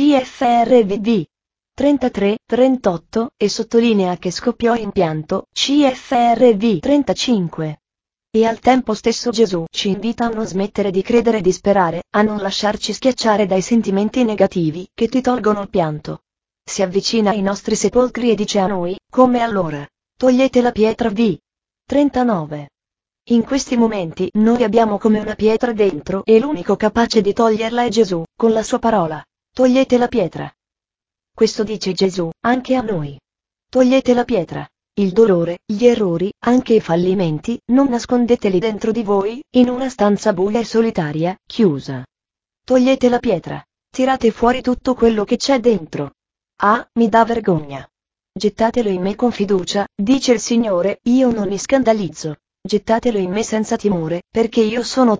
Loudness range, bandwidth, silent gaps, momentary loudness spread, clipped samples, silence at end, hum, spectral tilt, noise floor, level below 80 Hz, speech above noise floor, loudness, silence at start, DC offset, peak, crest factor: 3 LU; 8 kHz; none; 8 LU; under 0.1%; 0 s; none; -5.5 dB/octave; -89 dBFS; -46 dBFS; 74 dB; -17 LUFS; 0 s; under 0.1%; 0 dBFS; 16 dB